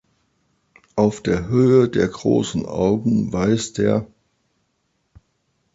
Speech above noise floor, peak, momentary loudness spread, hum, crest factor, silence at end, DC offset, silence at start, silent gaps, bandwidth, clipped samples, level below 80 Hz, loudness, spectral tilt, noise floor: 52 dB; -4 dBFS; 7 LU; none; 18 dB; 1.7 s; under 0.1%; 0.95 s; none; 8 kHz; under 0.1%; -46 dBFS; -19 LUFS; -6.5 dB/octave; -70 dBFS